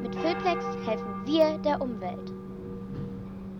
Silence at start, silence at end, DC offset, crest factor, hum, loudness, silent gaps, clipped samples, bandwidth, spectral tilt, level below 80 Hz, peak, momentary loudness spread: 0 s; 0 s; under 0.1%; 18 dB; none; -30 LUFS; none; under 0.1%; 17 kHz; -7 dB/octave; -54 dBFS; -10 dBFS; 15 LU